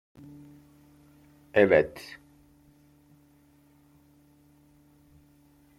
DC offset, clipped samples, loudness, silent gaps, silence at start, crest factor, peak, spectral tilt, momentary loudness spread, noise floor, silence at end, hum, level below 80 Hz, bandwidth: under 0.1%; under 0.1%; -24 LUFS; none; 1.55 s; 26 dB; -6 dBFS; -6.5 dB/octave; 29 LU; -61 dBFS; 3.8 s; none; -64 dBFS; 15 kHz